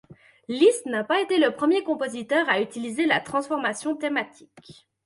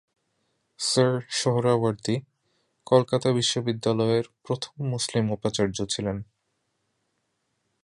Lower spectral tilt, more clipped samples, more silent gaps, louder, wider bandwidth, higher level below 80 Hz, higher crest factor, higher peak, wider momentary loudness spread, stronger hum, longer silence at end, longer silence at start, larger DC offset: second, -3.5 dB/octave vs -5 dB/octave; neither; neither; about the same, -24 LUFS vs -25 LUFS; about the same, 11.5 kHz vs 11.5 kHz; second, -72 dBFS vs -58 dBFS; about the same, 18 dB vs 22 dB; about the same, -6 dBFS vs -6 dBFS; about the same, 8 LU vs 9 LU; neither; second, 0.35 s vs 1.6 s; second, 0.1 s vs 0.8 s; neither